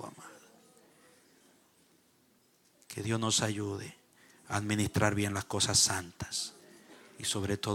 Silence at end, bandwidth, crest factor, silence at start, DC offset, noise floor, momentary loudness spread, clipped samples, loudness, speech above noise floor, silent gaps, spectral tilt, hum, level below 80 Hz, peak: 0 s; 17 kHz; 24 dB; 0 s; under 0.1%; -68 dBFS; 19 LU; under 0.1%; -31 LUFS; 36 dB; none; -3 dB/octave; none; -62 dBFS; -10 dBFS